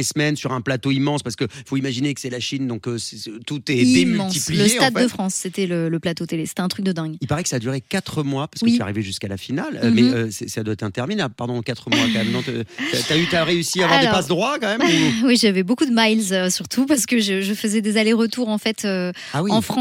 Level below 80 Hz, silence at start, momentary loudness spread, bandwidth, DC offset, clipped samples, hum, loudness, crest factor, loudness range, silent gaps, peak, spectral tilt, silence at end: -58 dBFS; 0 s; 10 LU; 16.5 kHz; under 0.1%; under 0.1%; none; -20 LUFS; 18 dB; 6 LU; none; -2 dBFS; -4 dB/octave; 0 s